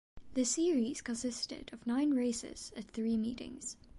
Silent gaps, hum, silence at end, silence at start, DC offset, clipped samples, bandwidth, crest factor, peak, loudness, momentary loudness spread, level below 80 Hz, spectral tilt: none; none; 0 s; 0.15 s; under 0.1%; under 0.1%; 11.5 kHz; 14 dB; -22 dBFS; -36 LUFS; 12 LU; -62 dBFS; -3.5 dB/octave